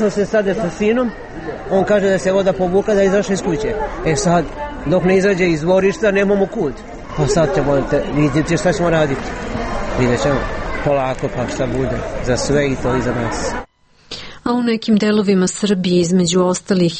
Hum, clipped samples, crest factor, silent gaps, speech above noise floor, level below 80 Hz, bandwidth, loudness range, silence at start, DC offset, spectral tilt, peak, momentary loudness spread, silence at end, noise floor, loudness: none; under 0.1%; 12 dB; none; 22 dB; -32 dBFS; 8.8 kHz; 3 LU; 0 s; under 0.1%; -5.5 dB/octave; -4 dBFS; 9 LU; 0 s; -37 dBFS; -17 LUFS